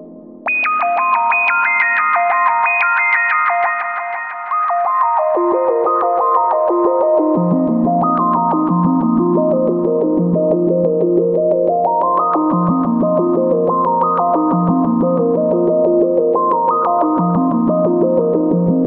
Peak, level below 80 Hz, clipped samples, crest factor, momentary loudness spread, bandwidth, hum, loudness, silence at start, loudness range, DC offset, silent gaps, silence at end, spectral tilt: -2 dBFS; -54 dBFS; under 0.1%; 14 dB; 3 LU; 4.4 kHz; none; -14 LUFS; 0 s; 1 LU; under 0.1%; none; 0 s; -11.5 dB/octave